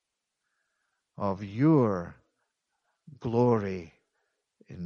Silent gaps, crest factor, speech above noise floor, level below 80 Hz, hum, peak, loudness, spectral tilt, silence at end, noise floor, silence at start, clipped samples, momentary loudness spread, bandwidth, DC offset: none; 20 dB; 57 dB; -64 dBFS; none; -12 dBFS; -27 LUFS; -9.5 dB/octave; 0 s; -83 dBFS; 1.2 s; under 0.1%; 16 LU; 6.8 kHz; under 0.1%